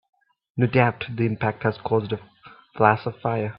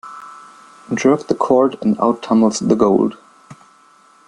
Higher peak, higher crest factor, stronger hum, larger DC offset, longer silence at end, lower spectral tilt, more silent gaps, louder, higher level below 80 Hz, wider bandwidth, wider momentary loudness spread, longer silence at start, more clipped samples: about the same, 0 dBFS vs -2 dBFS; first, 24 dB vs 16 dB; neither; neither; second, 0 s vs 0.75 s; first, -11.5 dB/octave vs -6 dB/octave; neither; second, -23 LUFS vs -16 LUFS; about the same, -58 dBFS vs -58 dBFS; second, 5.4 kHz vs 10.5 kHz; about the same, 12 LU vs 14 LU; first, 0.55 s vs 0.05 s; neither